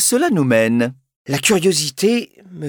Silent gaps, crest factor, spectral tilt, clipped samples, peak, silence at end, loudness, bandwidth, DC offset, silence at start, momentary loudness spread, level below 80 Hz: 1.16-1.25 s; 14 dB; -4 dB/octave; under 0.1%; -2 dBFS; 0 s; -16 LUFS; over 20 kHz; under 0.1%; 0 s; 9 LU; -58 dBFS